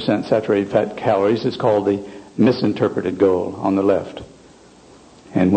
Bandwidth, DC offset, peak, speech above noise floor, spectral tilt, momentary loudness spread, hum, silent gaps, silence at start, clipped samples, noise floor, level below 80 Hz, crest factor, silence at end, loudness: 9 kHz; under 0.1%; -2 dBFS; 28 dB; -7.5 dB/octave; 7 LU; none; none; 0 s; under 0.1%; -46 dBFS; -54 dBFS; 16 dB; 0 s; -19 LUFS